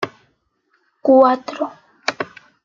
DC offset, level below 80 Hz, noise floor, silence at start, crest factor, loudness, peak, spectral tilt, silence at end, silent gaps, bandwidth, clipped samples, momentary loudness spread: under 0.1%; -70 dBFS; -65 dBFS; 0 s; 18 dB; -17 LUFS; -2 dBFS; -4.5 dB/octave; 0.4 s; none; 7.4 kHz; under 0.1%; 17 LU